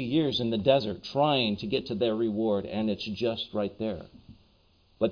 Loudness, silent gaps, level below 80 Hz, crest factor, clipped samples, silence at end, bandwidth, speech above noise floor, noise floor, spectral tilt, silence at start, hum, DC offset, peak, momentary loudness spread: -28 LUFS; none; -58 dBFS; 20 dB; under 0.1%; 0 s; 5.2 kHz; 35 dB; -63 dBFS; -7 dB/octave; 0 s; none; under 0.1%; -10 dBFS; 8 LU